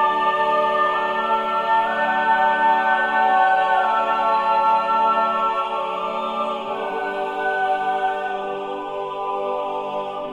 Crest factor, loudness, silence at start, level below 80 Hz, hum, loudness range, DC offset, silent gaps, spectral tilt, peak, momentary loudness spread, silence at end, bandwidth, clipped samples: 14 dB; -20 LUFS; 0 s; -60 dBFS; none; 6 LU; under 0.1%; none; -4 dB/octave; -6 dBFS; 9 LU; 0 s; 10.5 kHz; under 0.1%